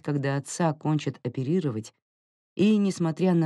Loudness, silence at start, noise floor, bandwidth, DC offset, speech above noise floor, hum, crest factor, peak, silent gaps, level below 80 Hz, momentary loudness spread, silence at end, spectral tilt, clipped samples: -26 LUFS; 0.05 s; under -90 dBFS; 11.5 kHz; under 0.1%; over 65 dB; none; 14 dB; -12 dBFS; 2.02-2.56 s; -78 dBFS; 11 LU; 0 s; -7 dB/octave; under 0.1%